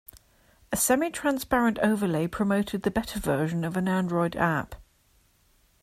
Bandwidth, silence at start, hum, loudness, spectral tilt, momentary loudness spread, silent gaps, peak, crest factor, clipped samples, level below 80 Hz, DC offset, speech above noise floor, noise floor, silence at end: 16 kHz; 0.15 s; none; -26 LUFS; -5 dB/octave; 5 LU; none; -10 dBFS; 18 dB; under 0.1%; -50 dBFS; under 0.1%; 38 dB; -64 dBFS; 1 s